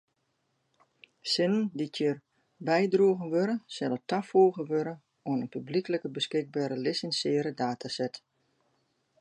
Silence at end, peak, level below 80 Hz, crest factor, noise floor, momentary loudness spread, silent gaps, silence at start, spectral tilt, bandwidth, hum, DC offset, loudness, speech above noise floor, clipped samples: 1.05 s; -12 dBFS; -80 dBFS; 18 dB; -77 dBFS; 10 LU; none; 1.25 s; -5.5 dB/octave; 11 kHz; none; under 0.1%; -29 LUFS; 48 dB; under 0.1%